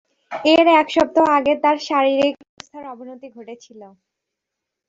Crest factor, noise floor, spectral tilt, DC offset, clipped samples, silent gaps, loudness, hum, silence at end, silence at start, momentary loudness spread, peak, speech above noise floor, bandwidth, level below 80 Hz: 18 dB; -82 dBFS; -4 dB/octave; under 0.1%; under 0.1%; 2.49-2.57 s; -16 LUFS; none; 1 s; 0.3 s; 24 LU; -2 dBFS; 64 dB; 7.8 kHz; -60 dBFS